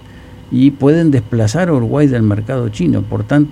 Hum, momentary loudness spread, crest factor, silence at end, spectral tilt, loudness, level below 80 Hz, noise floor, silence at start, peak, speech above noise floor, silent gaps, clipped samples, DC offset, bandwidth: none; 6 LU; 12 dB; 0 s; -8 dB/octave; -14 LUFS; -38 dBFS; -35 dBFS; 0.15 s; 0 dBFS; 23 dB; none; under 0.1%; under 0.1%; 11.5 kHz